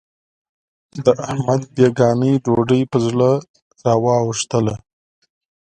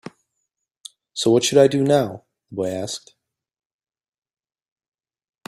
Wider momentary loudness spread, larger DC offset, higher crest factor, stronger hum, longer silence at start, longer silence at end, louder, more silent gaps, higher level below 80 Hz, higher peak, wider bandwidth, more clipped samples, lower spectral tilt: second, 7 LU vs 17 LU; neither; about the same, 18 dB vs 22 dB; neither; second, 0.95 s vs 1.15 s; second, 0.9 s vs 2.5 s; about the same, -17 LUFS vs -19 LUFS; first, 3.49-3.54 s, 3.62-3.71 s vs none; first, -52 dBFS vs -64 dBFS; about the same, 0 dBFS vs -2 dBFS; second, 9.6 kHz vs 15 kHz; neither; first, -6.5 dB/octave vs -5 dB/octave